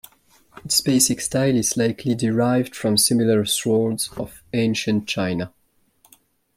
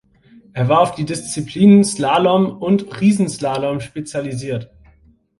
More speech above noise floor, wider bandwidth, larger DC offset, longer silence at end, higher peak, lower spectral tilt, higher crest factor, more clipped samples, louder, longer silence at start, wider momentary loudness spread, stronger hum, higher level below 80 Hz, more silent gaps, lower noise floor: about the same, 39 dB vs 36 dB; first, 16.5 kHz vs 11.5 kHz; neither; first, 1.1 s vs 0.75 s; about the same, -2 dBFS vs 0 dBFS; second, -4 dB/octave vs -6 dB/octave; about the same, 18 dB vs 16 dB; neither; second, -20 LUFS vs -17 LUFS; about the same, 0.65 s vs 0.55 s; second, 10 LU vs 14 LU; neither; about the same, -56 dBFS vs -52 dBFS; neither; first, -60 dBFS vs -52 dBFS